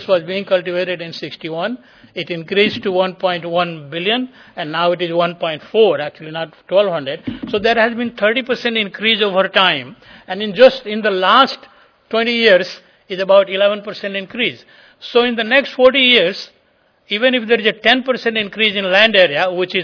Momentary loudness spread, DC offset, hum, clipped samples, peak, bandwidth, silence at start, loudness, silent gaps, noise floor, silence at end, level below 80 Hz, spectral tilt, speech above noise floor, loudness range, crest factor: 15 LU; under 0.1%; none; under 0.1%; 0 dBFS; 5.4 kHz; 0 s; -15 LUFS; none; -57 dBFS; 0 s; -58 dBFS; -5 dB/octave; 41 dB; 5 LU; 16 dB